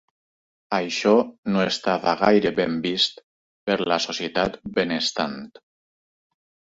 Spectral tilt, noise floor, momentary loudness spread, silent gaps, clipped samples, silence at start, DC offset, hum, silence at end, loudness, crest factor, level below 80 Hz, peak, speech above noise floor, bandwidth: -4.5 dB/octave; under -90 dBFS; 8 LU; 1.38-1.43 s, 3.23-3.67 s; under 0.1%; 0.7 s; under 0.1%; none; 1.2 s; -22 LUFS; 20 dB; -58 dBFS; -4 dBFS; over 68 dB; 8 kHz